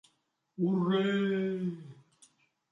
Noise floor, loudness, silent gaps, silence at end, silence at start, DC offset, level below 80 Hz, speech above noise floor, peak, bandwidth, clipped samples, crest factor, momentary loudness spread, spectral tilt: -77 dBFS; -31 LUFS; none; 0.8 s; 0.6 s; under 0.1%; -78 dBFS; 47 dB; -18 dBFS; 9.8 kHz; under 0.1%; 16 dB; 14 LU; -8 dB/octave